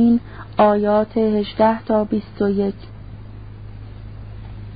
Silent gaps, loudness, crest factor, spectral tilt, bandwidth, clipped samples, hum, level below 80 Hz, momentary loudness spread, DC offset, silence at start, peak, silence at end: none; -19 LUFS; 18 dB; -12 dB/octave; 5 kHz; under 0.1%; none; -42 dBFS; 21 LU; 0.5%; 0 s; -2 dBFS; 0 s